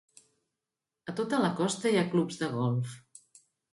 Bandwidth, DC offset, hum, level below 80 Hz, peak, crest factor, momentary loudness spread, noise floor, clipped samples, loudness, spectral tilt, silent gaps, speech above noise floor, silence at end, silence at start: 11.5 kHz; under 0.1%; none; -72 dBFS; -14 dBFS; 18 dB; 13 LU; -89 dBFS; under 0.1%; -30 LUFS; -5.5 dB/octave; none; 60 dB; 0.75 s; 1.05 s